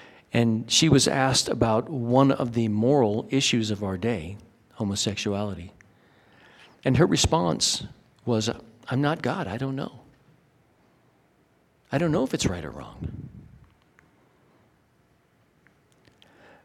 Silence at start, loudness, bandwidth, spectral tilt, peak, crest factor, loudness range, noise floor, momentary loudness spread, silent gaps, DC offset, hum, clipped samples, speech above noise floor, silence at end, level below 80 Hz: 0 s; -24 LUFS; 15.5 kHz; -4.5 dB/octave; -6 dBFS; 22 dB; 10 LU; -64 dBFS; 17 LU; none; under 0.1%; none; under 0.1%; 40 dB; 3.2 s; -50 dBFS